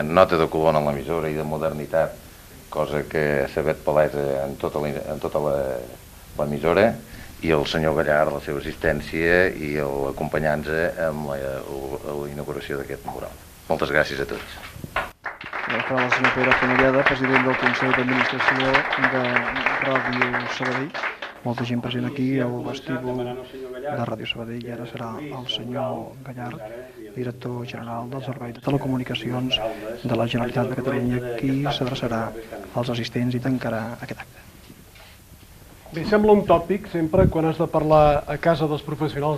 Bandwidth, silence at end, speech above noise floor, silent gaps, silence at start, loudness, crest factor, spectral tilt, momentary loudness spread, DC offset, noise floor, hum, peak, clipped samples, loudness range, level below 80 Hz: 14.5 kHz; 0 s; 24 dB; none; 0 s; -23 LUFS; 22 dB; -6 dB/octave; 14 LU; under 0.1%; -47 dBFS; none; 0 dBFS; under 0.1%; 10 LU; -44 dBFS